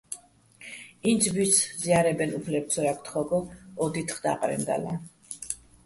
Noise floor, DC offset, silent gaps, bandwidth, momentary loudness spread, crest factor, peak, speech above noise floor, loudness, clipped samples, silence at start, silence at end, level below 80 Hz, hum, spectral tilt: -53 dBFS; under 0.1%; none; 12 kHz; 18 LU; 20 dB; -8 dBFS; 26 dB; -27 LUFS; under 0.1%; 0.1 s; 0.3 s; -60 dBFS; none; -4 dB/octave